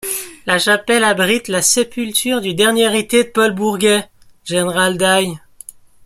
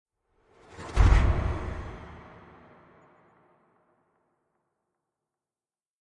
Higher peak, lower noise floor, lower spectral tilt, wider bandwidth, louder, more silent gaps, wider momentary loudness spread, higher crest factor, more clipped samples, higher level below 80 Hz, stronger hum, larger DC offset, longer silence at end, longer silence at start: first, 0 dBFS vs -8 dBFS; second, -39 dBFS vs under -90 dBFS; second, -2.5 dB/octave vs -7 dB/octave; first, 16 kHz vs 9 kHz; first, -15 LUFS vs -27 LUFS; neither; second, 8 LU vs 25 LU; second, 16 dB vs 22 dB; neither; second, -54 dBFS vs -32 dBFS; neither; neither; second, 0.7 s vs 3.8 s; second, 0.05 s vs 0.8 s